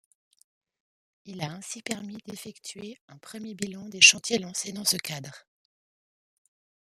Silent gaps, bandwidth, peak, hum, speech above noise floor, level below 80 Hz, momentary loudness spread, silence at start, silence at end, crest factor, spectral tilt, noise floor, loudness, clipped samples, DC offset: 3.01-3.08 s; 15 kHz; -2 dBFS; none; over 62 dB; -74 dBFS; 26 LU; 1.25 s; 1.45 s; 30 dB; -1 dB/octave; under -90 dBFS; -24 LUFS; under 0.1%; under 0.1%